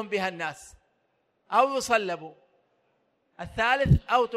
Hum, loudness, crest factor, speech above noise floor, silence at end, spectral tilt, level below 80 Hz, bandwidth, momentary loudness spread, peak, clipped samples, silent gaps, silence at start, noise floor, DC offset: none; -25 LUFS; 20 dB; 47 dB; 0 s; -5.5 dB/octave; -42 dBFS; 14 kHz; 18 LU; -8 dBFS; under 0.1%; none; 0 s; -72 dBFS; under 0.1%